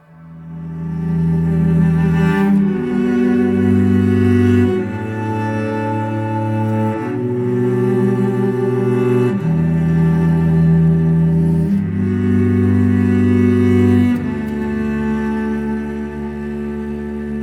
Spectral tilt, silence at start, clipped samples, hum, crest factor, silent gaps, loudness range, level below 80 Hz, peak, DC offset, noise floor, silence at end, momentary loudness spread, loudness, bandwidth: -9.5 dB/octave; 0.2 s; under 0.1%; none; 12 dB; none; 4 LU; -40 dBFS; -4 dBFS; under 0.1%; -36 dBFS; 0 s; 11 LU; -16 LUFS; 9.8 kHz